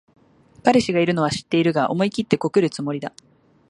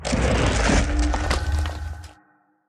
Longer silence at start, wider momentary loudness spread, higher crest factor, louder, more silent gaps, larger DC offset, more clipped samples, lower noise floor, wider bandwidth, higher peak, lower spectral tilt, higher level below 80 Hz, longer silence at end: first, 0.65 s vs 0 s; second, 9 LU vs 14 LU; about the same, 20 dB vs 16 dB; about the same, -20 LUFS vs -22 LUFS; neither; neither; neither; second, -47 dBFS vs -60 dBFS; about the same, 11.5 kHz vs 12 kHz; first, 0 dBFS vs -6 dBFS; about the same, -6 dB/octave vs -5 dB/octave; second, -58 dBFS vs -26 dBFS; about the same, 0.6 s vs 0.55 s